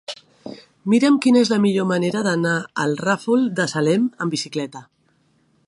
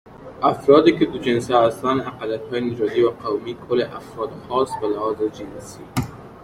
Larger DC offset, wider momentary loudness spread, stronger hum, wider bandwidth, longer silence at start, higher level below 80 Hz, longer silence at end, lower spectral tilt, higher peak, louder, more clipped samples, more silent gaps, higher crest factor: neither; about the same, 18 LU vs 16 LU; neither; second, 11.5 kHz vs 15 kHz; about the same, 0.1 s vs 0.05 s; second, -68 dBFS vs -52 dBFS; first, 0.85 s vs 0 s; about the same, -5.5 dB/octave vs -6 dB/octave; about the same, -4 dBFS vs -2 dBFS; about the same, -19 LUFS vs -21 LUFS; neither; neither; about the same, 16 dB vs 20 dB